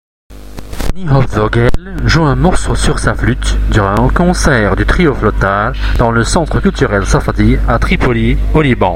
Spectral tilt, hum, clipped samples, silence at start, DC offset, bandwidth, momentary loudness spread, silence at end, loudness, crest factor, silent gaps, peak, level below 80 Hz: -6 dB/octave; none; 0.1%; 0.3 s; under 0.1%; 13.5 kHz; 5 LU; 0 s; -12 LUFS; 10 dB; none; 0 dBFS; -16 dBFS